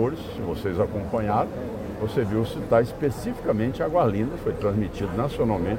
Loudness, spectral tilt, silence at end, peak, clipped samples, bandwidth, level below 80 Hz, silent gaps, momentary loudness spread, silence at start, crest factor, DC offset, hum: -26 LUFS; -8 dB/octave; 0 s; -6 dBFS; under 0.1%; 16.5 kHz; -42 dBFS; none; 7 LU; 0 s; 18 dB; under 0.1%; none